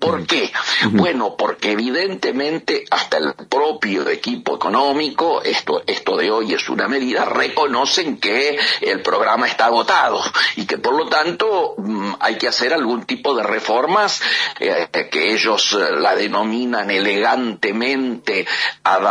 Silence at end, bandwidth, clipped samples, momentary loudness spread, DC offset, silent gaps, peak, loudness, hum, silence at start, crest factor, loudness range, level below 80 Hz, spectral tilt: 0 s; 10.5 kHz; under 0.1%; 5 LU; under 0.1%; none; -2 dBFS; -17 LUFS; none; 0 s; 16 dB; 3 LU; -68 dBFS; -3 dB/octave